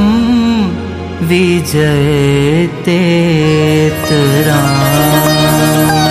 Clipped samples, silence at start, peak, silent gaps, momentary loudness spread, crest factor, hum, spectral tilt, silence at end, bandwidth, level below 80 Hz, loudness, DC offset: under 0.1%; 0 s; 0 dBFS; none; 4 LU; 10 dB; none; -5.5 dB/octave; 0 s; 15.5 kHz; -32 dBFS; -10 LUFS; under 0.1%